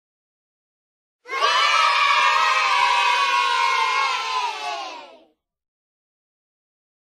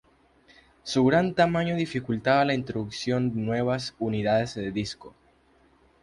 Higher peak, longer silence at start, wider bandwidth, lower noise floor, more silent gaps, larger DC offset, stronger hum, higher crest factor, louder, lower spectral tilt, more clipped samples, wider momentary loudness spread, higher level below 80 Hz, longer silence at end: about the same, -6 dBFS vs -8 dBFS; first, 1.25 s vs 0.85 s; first, 15 kHz vs 11.5 kHz; second, -55 dBFS vs -61 dBFS; neither; neither; neither; about the same, 18 dB vs 18 dB; first, -18 LUFS vs -26 LUFS; second, 2.5 dB/octave vs -6 dB/octave; neither; about the same, 12 LU vs 10 LU; second, -70 dBFS vs -56 dBFS; first, 2 s vs 0.95 s